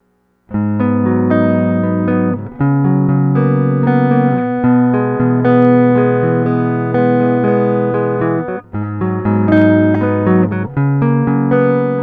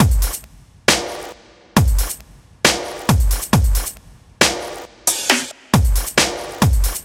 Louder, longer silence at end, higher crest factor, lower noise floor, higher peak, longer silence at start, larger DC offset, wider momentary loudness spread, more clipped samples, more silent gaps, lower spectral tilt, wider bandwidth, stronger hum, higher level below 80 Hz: first, -13 LUFS vs -18 LUFS; about the same, 0 s vs 0 s; second, 12 dB vs 18 dB; first, -54 dBFS vs -43 dBFS; about the same, 0 dBFS vs 0 dBFS; first, 0.5 s vs 0 s; neither; second, 7 LU vs 12 LU; neither; neither; first, -12 dB/octave vs -3.5 dB/octave; second, 4.5 kHz vs 17 kHz; neither; second, -46 dBFS vs -22 dBFS